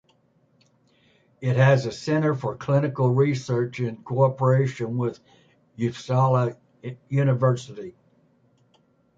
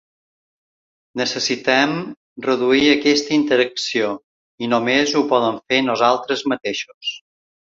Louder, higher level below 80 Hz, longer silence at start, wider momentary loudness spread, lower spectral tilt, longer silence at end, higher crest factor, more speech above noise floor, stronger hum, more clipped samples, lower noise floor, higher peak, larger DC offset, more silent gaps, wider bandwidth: second, -23 LUFS vs -18 LUFS; about the same, -62 dBFS vs -60 dBFS; first, 1.4 s vs 1.15 s; about the same, 11 LU vs 12 LU; first, -7.5 dB/octave vs -3.5 dB/octave; first, 1.25 s vs 0.55 s; about the same, 18 dB vs 18 dB; second, 41 dB vs over 72 dB; neither; neither; second, -63 dBFS vs under -90 dBFS; second, -6 dBFS vs -2 dBFS; neither; second, none vs 2.17-2.36 s, 4.23-4.58 s, 6.94-7.01 s; about the same, 7.6 kHz vs 7.8 kHz